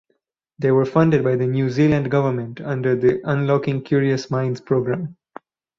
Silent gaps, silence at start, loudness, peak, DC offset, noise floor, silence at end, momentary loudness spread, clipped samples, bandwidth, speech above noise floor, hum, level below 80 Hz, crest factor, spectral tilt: none; 0.6 s; -20 LUFS; -4 dBFS; under 0.1%; -70 dBFS; 0.65 s; 8 LU; under 0.1%; 7.4 kHz; 52 dB; none; -54 dBFS; 16 dB; -8.5 dB/octave